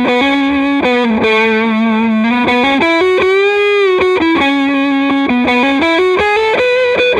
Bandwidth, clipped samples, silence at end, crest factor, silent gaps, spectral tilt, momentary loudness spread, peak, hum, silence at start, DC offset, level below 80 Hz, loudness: 10 kHz; under 0.1%; 0 s; 10 dB; none; -5 dB/octave; 2 LU; 0 dBFS; none; 0 s; under 0.1%; -44 dBFS; -11 LUFS